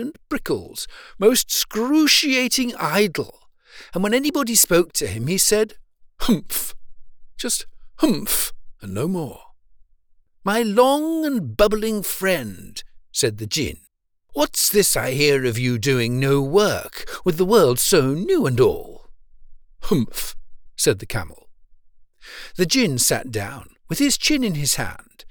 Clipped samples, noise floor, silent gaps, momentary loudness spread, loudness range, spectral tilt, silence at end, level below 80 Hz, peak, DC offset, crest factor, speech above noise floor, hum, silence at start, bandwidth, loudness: under 0.1%; -55 dBFS; none; 16 LU; 6 LU; -3.5 dB/octave; 0 s; -42 dBFS; -4 dBFS; under 0.1%; 18 dB; 35 dB; none; 0 s; over 20 kHz; -20 LUFS